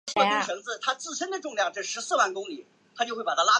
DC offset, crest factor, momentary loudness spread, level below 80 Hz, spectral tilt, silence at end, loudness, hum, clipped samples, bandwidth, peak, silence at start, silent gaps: under 0.1%; 20 dB; 8 LU; -80 dBFS; -1 dB/octave; 0 s; -28 LUFS; none; under 0.1%; 10 kHz; -6 dBFS; 0.05 s; none